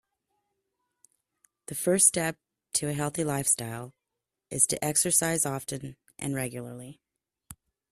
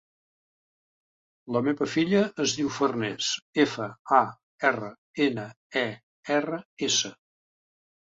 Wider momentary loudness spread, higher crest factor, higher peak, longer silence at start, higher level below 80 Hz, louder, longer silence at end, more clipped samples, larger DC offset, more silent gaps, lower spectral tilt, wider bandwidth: first, 21 LU vs 10 LU; about the same, 26 dB vs 24 dB; about the same, -6 dBFS vs -6 dBFS; first, 1.7 s vs 1.45 s; first, -64 dBFS vs -70 dBFS; about the same, -26 LUFS vs -27 LUFS; second, 0.4 s vs 1.05 s; neither; neither; second, none vs 3.42-3.53 s, 3.99-4.05 s, 4.43-4.58 s, 4.98-5.14 s, 5.56-5.70 s, 6.03-6.23 s, 6.65-6.77 s; about the same, -3 dB/octave vs -3.5 dB/octave; first, 15.5 kHz vs 8 kHz